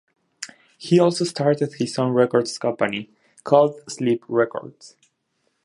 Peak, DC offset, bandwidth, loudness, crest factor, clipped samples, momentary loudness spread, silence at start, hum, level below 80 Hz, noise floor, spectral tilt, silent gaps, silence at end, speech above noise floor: -2 dBFS; under 0.1%; 11.5 kHz; -21 LUFS; 20 dB; under 0.1%; 19 LU; 0.4 s; none; -70 dBFS; -71 dBFS; -5.5 dB/octave; none; 0.75 s; 51 dB